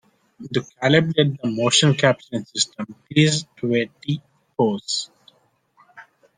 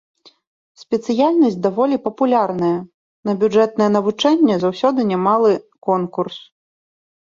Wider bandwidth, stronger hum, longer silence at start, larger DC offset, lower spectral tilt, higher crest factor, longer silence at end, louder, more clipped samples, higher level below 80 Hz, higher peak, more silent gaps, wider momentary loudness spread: first, 10 kHz vs 7.6 kHz; neither; second, 0.4 s vs 0.8 s; neither; second, -4.5 dB/octave vs -6.5 dB/octave; about the same, 20 dB vs 16 dB; second, 0.35 s vs 0.85 s; second, -21 LUFS vs -17 LUFS; neither; about the same, -62 dBFS vs -62 dBFS; about the same, -2 dBFS vs -2 dBFS; second, none vs 2.94-3.23 s; first, 12 LU vs 9 LU